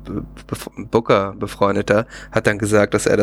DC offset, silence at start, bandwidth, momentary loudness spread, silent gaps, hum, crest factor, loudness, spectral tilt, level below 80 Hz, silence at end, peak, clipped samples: under 0.1%; 0 s; 16 kHz; 14 LU; none; none; 18 dB; -18 LUFS; -5.5 dB/octave; -42 dBFS; 0 s; -2 dBFS; under 0.1%